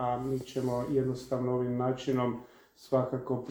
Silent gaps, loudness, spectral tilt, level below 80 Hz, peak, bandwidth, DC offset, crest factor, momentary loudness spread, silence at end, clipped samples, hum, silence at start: none; -32 LUFS; -7.5 dB/octave; -60 dBFS; -14 dBFS; over 20 kHz; under 0.1%; 18 dB; 4 LU; 0 s; under 0.1%; none; 0 s